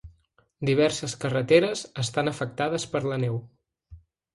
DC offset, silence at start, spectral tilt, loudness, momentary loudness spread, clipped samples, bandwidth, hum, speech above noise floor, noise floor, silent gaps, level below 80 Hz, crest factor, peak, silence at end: under 0.1%; 0.05 s; -5 dB/octave; -26 LUFS; 9 LU; under 0.1%; 11.5 kHz; none; 38 dB; -63 dBFS; none; -58 dBFS; 22 dB; -6 dBFS; 0.4 s